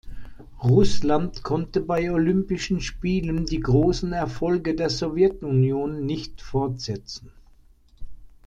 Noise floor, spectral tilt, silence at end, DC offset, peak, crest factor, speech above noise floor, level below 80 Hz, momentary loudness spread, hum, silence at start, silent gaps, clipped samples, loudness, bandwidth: -53 dBFS; -7 dB/octave; 0.15 s; under 0.1%; -6 dBFS; 18 dB; 31 dB; -38 dBFS; 9 LU; none; 0.05 s; none; under 0.1%; -24 LUFS; 9.2 kHz